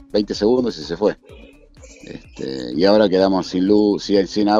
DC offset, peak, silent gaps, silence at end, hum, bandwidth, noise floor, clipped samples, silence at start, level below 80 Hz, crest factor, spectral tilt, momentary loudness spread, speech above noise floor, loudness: under 0.1%; -2 dBFS; none; 0 s; none; 7.8 kHz; -44 dBFS; under 0.1%; 0.15 s; -46 dBFS; 16 dB; -6 dB/octave; 19 LU; 27 dB; -18 LUFS